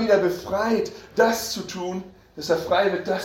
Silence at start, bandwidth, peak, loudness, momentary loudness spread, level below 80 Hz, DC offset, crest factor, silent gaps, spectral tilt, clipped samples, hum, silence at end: 0 s; 16.5 kHz; -4 dBFS; -23 LUFS; 11 LU; -54 dBFS; under 0.1%; 18 dB; none; -4 dB/octave; under 0.1%; none; 0 s